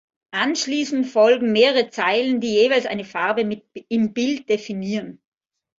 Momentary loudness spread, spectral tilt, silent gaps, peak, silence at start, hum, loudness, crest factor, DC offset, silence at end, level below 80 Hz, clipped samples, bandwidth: 11 LU; -4 dB/octave; none; -2 dBFS; 0.35 s; none; -20 LUFS; 18 dB; under 0.1%; 0.65 s; -66 dBFS; under 0.1%; 7.8 kHz